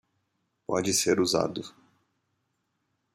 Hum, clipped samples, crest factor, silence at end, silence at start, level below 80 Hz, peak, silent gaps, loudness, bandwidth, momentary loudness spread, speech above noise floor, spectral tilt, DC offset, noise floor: none; under 0.1%; 20 dB; 1.45 s; 0.7 s; -68 dBFS; -10 dBFS; none; -26 LUFS; 15.5 kHz; 19 LU; 51 dB; -3 dB/octave; under 0.1%; -78 dBFS